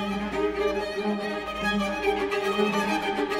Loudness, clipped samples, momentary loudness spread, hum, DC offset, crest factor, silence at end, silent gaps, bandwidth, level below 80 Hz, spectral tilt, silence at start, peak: -27 LUFS; under 0.1%; 4 LU; none; under 0.1%; 16 dB; 0 s; none; 16 kHz; -48 dBFS; -5 dB/octave; 0 s; -12 dBFS